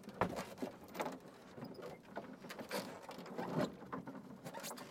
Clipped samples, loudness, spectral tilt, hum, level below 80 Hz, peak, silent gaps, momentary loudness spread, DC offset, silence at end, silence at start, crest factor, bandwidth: under 0.1%; -46 LUFS; -5 dB/octave; none; -72 dBFS; -20 dBFS; none; 11 LU; under 0.1%; 0 s; 0 s; 26 dB; 16.5 kHz